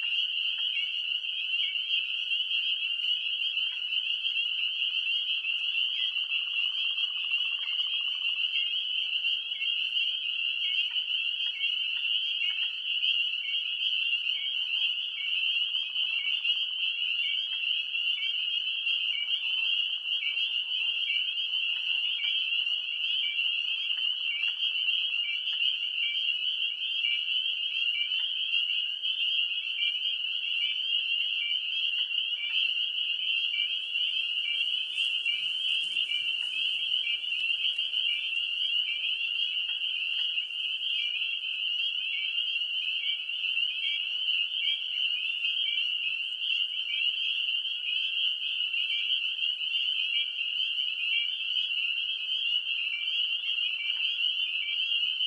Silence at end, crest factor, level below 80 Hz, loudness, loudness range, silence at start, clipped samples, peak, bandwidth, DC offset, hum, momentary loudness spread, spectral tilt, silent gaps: 0 s; 14 dB; -80 dBFS; -27 LUFS; 1 LU; 0 s; under 0.1%; -16 dBFS; 11 kHz; under 0.1%; none; 2 LU; 3.5 dB/octave; none